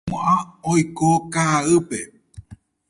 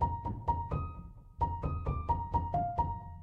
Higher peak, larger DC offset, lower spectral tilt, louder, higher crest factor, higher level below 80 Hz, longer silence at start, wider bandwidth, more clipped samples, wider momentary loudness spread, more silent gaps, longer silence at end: first, -6 dBFS vs -18 dBFS; neither; second, -5.5 dB/octave vs -10 dB/octave; first, -20 LUFS vs -35 LUFS; about the same, 16 dB vs 16 dB; second, -50 dBFS vs -42 dBFS; about the same, 0.05 s vs 0 s; first, 11.5 kHz vs 4.9 kHz; neither; first, 12 LU vs 7 LU; neither; first, 0.35 s vs 0 s